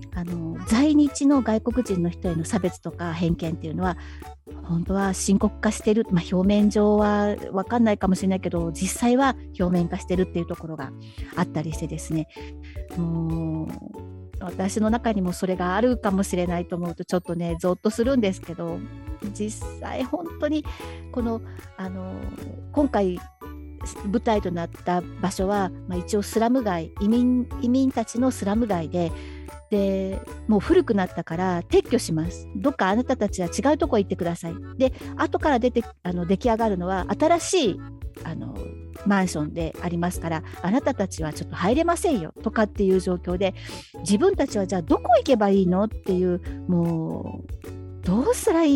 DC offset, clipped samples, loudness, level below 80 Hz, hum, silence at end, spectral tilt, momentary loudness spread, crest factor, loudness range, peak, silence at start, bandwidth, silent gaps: under 0.1%; under 0.1%; -24 LUFS; -40 dBFS; none; 0 s; -6 dB/octave; 15 LU; 16 dB; 7 LU; -8 dBFS; 0 s; 16.5 kHz; none